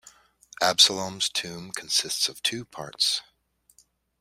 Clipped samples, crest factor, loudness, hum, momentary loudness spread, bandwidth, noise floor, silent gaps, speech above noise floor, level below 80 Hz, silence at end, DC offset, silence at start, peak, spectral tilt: under 0.1%; 26 dB; -23 LUFS; none; 17 LU; 16 kHz; -65 dBFS; none; 39 dB; -68 dBFS; 1 s; under 0.1%; 0.05 s; -2 dBFS; -0.5 dB/octave